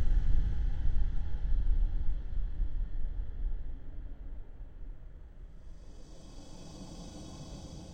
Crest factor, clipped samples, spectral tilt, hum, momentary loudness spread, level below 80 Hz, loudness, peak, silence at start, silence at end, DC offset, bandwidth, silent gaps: 16 dB; under 0.1%; -6.5 dB/octave; none; 19 LU; -32 dBFS; -39 LUFS; -14 dBFS; 0 s; 0 s; under 0.1%; 6.6 kHz; none